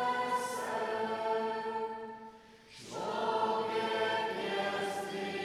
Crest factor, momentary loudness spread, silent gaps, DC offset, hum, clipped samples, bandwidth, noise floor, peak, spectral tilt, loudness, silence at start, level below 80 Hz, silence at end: 16 dB; 13 LU; none; under 0.1%; none; under 0.1%; 15 kHz; -55 dBFS; -20 dBFS; -3.5 dB/octave; -34 LUFS; 0 s; -76 dBFS; 0 s